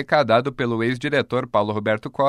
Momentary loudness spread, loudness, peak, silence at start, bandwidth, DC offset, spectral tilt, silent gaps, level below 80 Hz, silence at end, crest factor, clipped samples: 6 LU; -21 LUFS; -4 dBFS; 0 s; 11.5 kHz; under 0.1%; -6.5 dB/octave; none; -56 dBFS; 0 s; 16 dB; under 0.1%